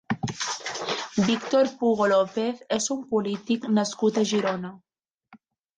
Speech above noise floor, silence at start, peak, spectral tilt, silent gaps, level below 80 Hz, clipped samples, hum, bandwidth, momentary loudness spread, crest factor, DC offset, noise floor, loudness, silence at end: 33 dB; 0.1 s; -10 dBFS; -4.5 dB/octave; 5.14-5.18 s; -64 dBFS; under 0.1%; none; 9.6 kHz; 8 LU; 16 dB; under 0.1%; -57 dBFS; -25 LUFS; 0.4 s